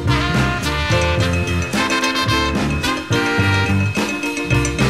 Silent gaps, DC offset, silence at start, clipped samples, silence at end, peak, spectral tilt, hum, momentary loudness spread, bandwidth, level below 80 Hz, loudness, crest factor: none; 0.4%; 0 s; under 0.1%; 0 s; -4 dBFS; -4.5 dB/octave; none; 3 LU; 15.5 kHz; -30 dBFS; -18 LUFS; 14 dB